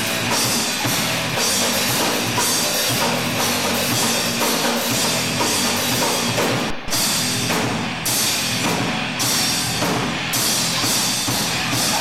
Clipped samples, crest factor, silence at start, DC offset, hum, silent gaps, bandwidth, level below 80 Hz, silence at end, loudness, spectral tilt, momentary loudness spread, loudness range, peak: under 0.1%; 12 dB; 0 s; 0.6%; none; none; 16.5 kHz; -48 dBFS; 0 s; -18 LUFS; -2 dB/octave; 3 LU; 1 LU; -8 dBFS